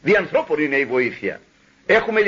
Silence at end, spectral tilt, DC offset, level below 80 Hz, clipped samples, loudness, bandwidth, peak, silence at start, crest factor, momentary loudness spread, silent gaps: 0 s; -6 dB/octave; under 0.1%; -54 dBFS; under 0.1%; -19 LUFS; 7.4 kHz; -4 dBFS; 0.05 s; 16 dB; 13 LU; none